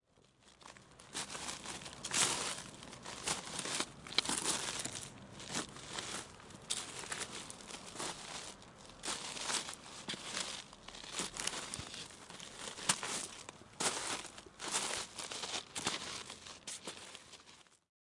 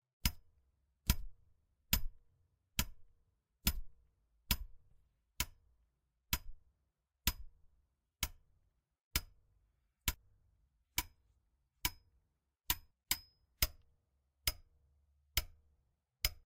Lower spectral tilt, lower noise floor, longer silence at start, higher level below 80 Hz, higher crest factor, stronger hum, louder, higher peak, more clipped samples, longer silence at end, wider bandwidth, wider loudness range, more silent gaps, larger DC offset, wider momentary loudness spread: about the same, -1 dB/octave vs -2 dB/octave; second, -67 dBFS vs -84 dBFS; first, 0.4 s vs 0.25 s; second, -70 dBFS vs -48 dBFS; about the same, 32 dB vs 30 dB; neither; about the same, -40 LUFS vs -40 LUFS; first, -10 dBFS vs -14 dBFS; neither; first, 0.4 s vs 0.05 s; second, 11.5 kHz vs 16 kHz; about the same, 6 LU vs 4 LU; second, none vs 9.04-9.11 s; neither; first, 16 LU vs 11 LU